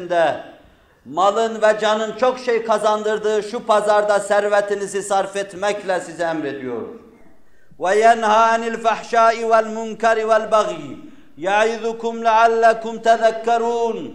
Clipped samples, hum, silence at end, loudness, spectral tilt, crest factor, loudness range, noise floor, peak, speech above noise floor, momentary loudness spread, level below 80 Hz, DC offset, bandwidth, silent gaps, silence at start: under 0.1%; none; 0 s; -18 LUFS; -3.5 dB/octave; 16 dB; 4 LU; -54 dBFS; -2 dBFS; 36 dB; 11 LU; -62 dBFS; under 0.1%; 11 kHz; none; 0 s